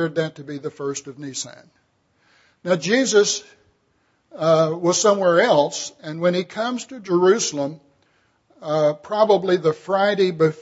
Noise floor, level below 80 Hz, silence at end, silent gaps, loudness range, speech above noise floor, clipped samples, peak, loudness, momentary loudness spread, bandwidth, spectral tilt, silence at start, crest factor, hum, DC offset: -65 dBFS; -70 dBFS; 0 s; none; 5 LU; 45 dB; under 0.1%; -2 dBFS; -20 LUFS; 14 LU; 8 kHz; -4 dB/octave; 0 s; 18 dB; none; under 0.1%